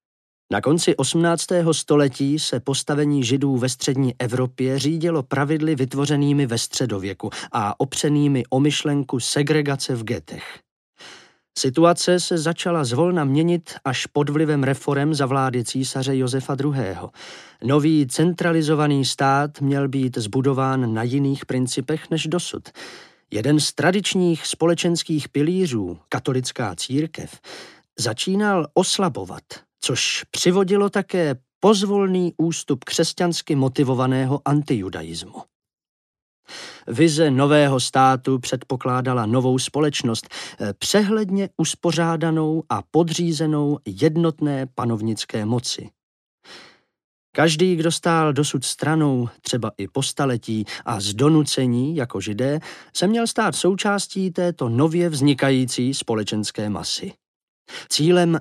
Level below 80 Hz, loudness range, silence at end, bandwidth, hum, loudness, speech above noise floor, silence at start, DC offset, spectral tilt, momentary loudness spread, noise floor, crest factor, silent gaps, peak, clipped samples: -62 dBFS; 3 LU; 0 s; 14 kHz; none; -21 LUFS; 27 dB; 0.5 s; under 0.1%; -5 dB/octave; 10 LU; -48 dBFS; 18 dB; 10.71-10.93 s, 31.55-31.61 s, 35.55-35.60 s, 35.89-36.14 s, 36.22-36.43 s, 46.03-46.38 s, 47.04-47.33 s, 57.28-57.65 s; -4 dBFS; under 0.1%